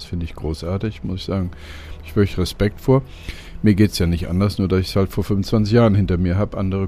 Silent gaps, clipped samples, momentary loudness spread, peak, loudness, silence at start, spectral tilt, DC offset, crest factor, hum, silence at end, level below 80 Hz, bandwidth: none; under 0.1%; 13 LU; -2 dBFS; -20 LUFS; 0 s; -7.5 dB/octave; under 0.1%; 18 dB; none; 0 s; -34 dBFS; 15 kHz